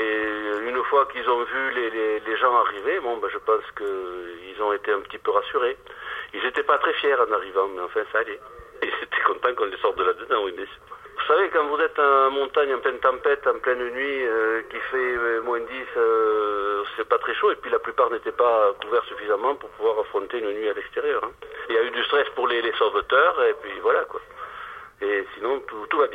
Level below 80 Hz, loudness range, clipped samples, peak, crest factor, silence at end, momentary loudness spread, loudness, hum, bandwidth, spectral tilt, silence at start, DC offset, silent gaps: -60 dBFS; 3 LU; under 0.1%; -4 dBFS; 20 dB; 0 s; 11 LU; -23 LUFS; none; 4.9 kHz; -4.5 dB/octave; 0 s; under 0.1%; none